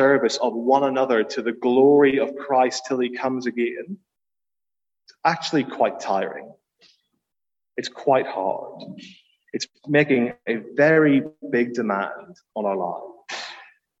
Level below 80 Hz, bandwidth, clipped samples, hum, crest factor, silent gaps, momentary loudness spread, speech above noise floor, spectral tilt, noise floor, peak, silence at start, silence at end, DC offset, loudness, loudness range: -72 dBFS; 8 kHz; under 0.1%; none; 20 dB; none; 18 LU; over 69 dB; -5.5 dB/octave; under -90 dBFS; -4 dBFS; 0 s; 0.35 s; under 0.1%; -22 LUFS; 7 LU